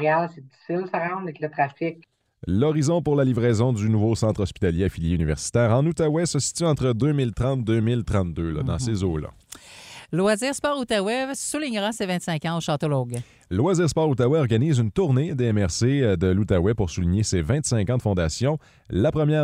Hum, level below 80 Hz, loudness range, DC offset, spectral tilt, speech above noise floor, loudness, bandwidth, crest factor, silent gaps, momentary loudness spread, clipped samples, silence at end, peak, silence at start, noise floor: none; -42 dBFS; 4 LU; under 0.1%; -6 dB/octave; 22 dB; -23 LUFS; 14 kHz; 16 dB; none; 9 LU; under 0.1%; 0 s; -8 dBFS; 0 s; -44 dBFS